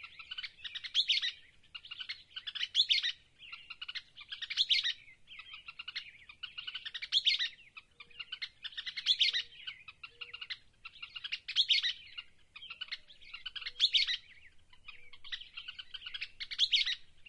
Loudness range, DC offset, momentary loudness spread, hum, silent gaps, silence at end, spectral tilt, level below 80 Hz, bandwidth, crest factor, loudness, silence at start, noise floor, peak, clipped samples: 3 LU; under 0.1%; 22 LU; none; none; 0.05 s; 3 dB/octave; -70 dBFS; 11.5 kHz; 22 dB; -33 LUFS; 0 s; -58 dBFS; -16 dBFS; under 0.1%